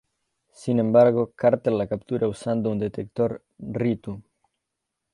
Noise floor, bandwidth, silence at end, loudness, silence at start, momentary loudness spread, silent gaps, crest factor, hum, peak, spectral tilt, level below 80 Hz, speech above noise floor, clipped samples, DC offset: -82 dBFS; 11 kHz; 0.95 s; -23 LUFS; 0.6 s; 17 LU; none; 18 dB; none; -6 dBFS; -8.5 dB/octave; -58 dBFS; 59 dB; under 0.1%; under 0.1%